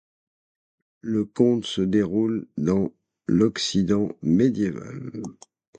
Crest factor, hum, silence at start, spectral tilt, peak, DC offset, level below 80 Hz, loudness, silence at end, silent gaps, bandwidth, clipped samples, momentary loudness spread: 18 dB; none; 1.05 s; -6.5 dB/octave; -6 dBFS; under 0.1%; -54 dBFS; -23 LUFS; 0.45 s; none; 9.2 kHz; under 0.1%; 14 LU